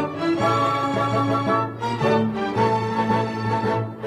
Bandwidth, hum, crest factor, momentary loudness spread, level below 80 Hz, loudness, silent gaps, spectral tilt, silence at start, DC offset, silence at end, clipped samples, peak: 12.5 kHz; none; 14 dB; 3 LU; -56 dBFS; -22 LUFS; none; -7 dB/octave; 0 s; under 0.1%; 0 s; under 0.1%; -8 dBFS